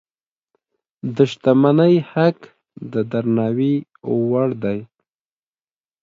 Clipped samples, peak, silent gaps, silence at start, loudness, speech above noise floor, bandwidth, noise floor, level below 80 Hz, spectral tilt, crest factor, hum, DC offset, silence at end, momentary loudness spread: under 0.1%; 0 dBFS; none; 1.05 s; -18 LUFS; over 73 dB; 7.6 kHz; under -90 dBFS; -62 dBFS; -8.5 dB/octave; 18 dB; none; under 0.1%; 1.2 s; 14 LU